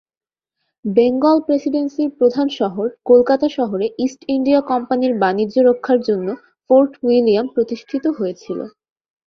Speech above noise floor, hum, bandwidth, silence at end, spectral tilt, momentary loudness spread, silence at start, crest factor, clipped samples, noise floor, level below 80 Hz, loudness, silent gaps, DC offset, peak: 59 dB; none; 6.6 kHz; 0.6 s; -7 dB/octave; 10 LU; 0.85 s; 16 dB; under 0.1%; -75 dBFS; -60 dBFS; -17 LUFS; none; under 0.1%; -2 dBFS